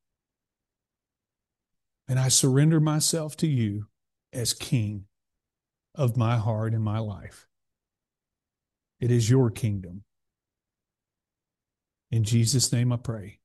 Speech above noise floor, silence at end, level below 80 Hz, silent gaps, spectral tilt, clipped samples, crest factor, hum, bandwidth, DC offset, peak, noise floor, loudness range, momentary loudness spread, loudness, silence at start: 65 dB; 0.15 s; -58 dBFS; none; -5 dB/octave; under 0.1%; 20 dB; none; 12.5 kHz; under 0.1%; -8 dBFS; -90 dBFS; 6 LU; 15 LU; -25 LUFS; 2.1 s